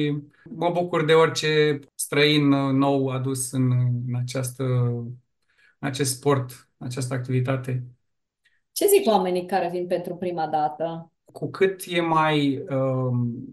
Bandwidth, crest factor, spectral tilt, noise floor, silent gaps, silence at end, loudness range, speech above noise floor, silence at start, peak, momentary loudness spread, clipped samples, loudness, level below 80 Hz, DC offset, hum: 12.5 kHz; 18 dB; -5.5 dB/octave; -71 dBFS; none; 0 s; 6 LU; 48 dB; 0 s; -6 dBFS; 14 LU; under 0.1%; -23 LUFS; -66 dBFS; under 0.1%; none